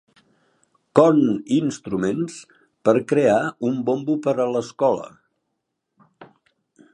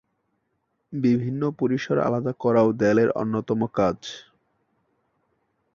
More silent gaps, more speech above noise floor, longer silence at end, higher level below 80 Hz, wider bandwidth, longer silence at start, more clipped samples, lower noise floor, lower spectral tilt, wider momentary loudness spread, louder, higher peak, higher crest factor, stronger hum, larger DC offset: neither; first, 58 dB vs 52 dB; second, 0.7 s vs 1.55 s; about the same, -64 dBFS vs -60 dBFS; first, 11 kHz vs 7.2 kHz; about the same, 0.95 s vs 0.9 s; neither; about the same, -77 dBFS vs -74 dBFS; about the same, -6.5 dB/octave vs -7.5 dB/octave; about the same, 11 LU vs 11 LU; about the same, -21 LUFS vs -23 LUFS; first, 0 dBFS vs -6 dBFS; about the same, 22 dB vs 18 dB; neither; neither